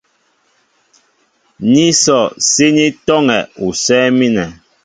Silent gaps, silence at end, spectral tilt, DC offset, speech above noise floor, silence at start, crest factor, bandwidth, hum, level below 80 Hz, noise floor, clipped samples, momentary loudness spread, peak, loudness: none; 0.3 s; -3.5 dB/octave; under 0.1%; 47 dB; 1.6 s; 14 dB; 9.6 kHz; none; -50 dBFS; -59 dBFS; under 0.1%; 9 LU; 0 dBFS; -12 LUFS